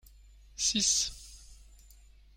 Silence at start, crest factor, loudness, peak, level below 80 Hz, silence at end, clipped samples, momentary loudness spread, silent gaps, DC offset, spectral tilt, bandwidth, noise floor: 0.6 s; 22 dB; -28 LUFS; -14 dBFS; -54 dBFS; 0.8 s; under 0.1%; 24 LU; none; under 0.1%; 0 dB/octave; 16.5 kHz; -57 dBFS